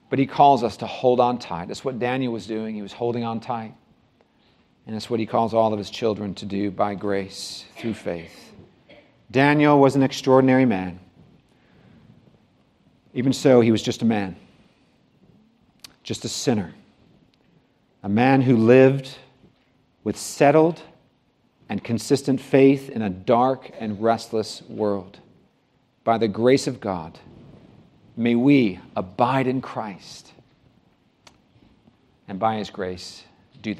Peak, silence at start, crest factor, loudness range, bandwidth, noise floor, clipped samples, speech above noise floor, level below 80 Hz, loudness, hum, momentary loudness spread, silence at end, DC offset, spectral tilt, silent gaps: -2 dBFS; 0.1 s; 20 dB; 9 LU; 13.5 kHz; -64 dBFS; under 0.1%; 43 dB; -64 dBFS; -21 LUFS; none; 17 LU; 0 s; under 0.1%; -6 dB/octave; none